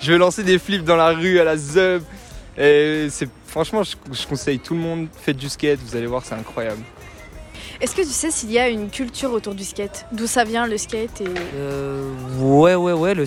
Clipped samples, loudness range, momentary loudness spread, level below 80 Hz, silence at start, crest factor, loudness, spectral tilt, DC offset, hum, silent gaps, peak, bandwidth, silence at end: under 0.1%; 7 LU; 13 LU; -44 dBFS; 0 s; 16 dB; -20 LUFS; -4.5 dB/octave; under 0.1%; none; none; -4 dBFS; 16.5 kHz; 0 s